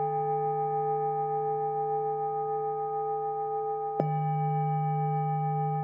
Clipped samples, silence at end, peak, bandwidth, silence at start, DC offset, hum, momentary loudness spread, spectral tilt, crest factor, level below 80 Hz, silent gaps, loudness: under 0.1%; 0 s; -10 dBFS; 3.1 kHz; 0 s; under 0.1%; none; 3 LU; -10 dB/octave; 20 dB; -84 dBFS; none; -30 LUFS